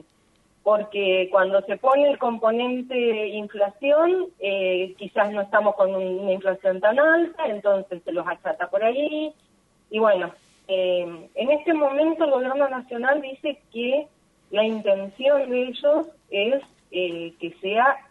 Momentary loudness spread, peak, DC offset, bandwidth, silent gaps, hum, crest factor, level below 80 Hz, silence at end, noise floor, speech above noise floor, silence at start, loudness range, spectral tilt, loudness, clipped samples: 9 LU; -6 dBFS; under 0.1%; 4.2 kHz; none; none; 16 dB; -72 dBFS; 0.1 s; -62 dBFS; 40 dB; 0.65 s; 3 LU; -6 dB/octave; -23 LUFS; under 0.1%